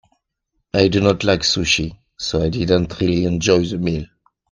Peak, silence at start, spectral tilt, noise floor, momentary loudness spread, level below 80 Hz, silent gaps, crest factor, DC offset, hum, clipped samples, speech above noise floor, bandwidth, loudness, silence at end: 0 dBFS; 0.75 s; -5 dB/octave; -73 dBFS; 9 LU; -40 dBFS; none; 18 dB; under 0.1%; none; under 0.1%; 55 dB; 10 kHz; -18 LUFS; 0.45 s